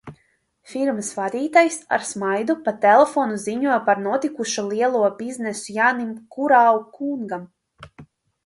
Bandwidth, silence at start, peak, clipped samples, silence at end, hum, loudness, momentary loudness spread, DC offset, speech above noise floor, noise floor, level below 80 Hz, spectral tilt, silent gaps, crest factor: 11.5 kHz; 0.05 s; -2 dBFS; under 0.1%; 0.4 s; none; -20 LUFS; 13 LU; under 0.1%; 45 dB; -65 dBFS; -66 dBFS; -4 dB/octave; none; 20 dB